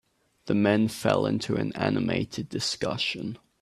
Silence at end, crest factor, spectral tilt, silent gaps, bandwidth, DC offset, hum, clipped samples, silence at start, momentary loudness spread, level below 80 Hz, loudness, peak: 0.25 s; 20 dB; -5 dB/octave; none; 13.5 kHz; under 0.1%; none; under 0.1%; 0.45 s; 9 LU; -60 dBFS; -27 LUFS; -8 dBFS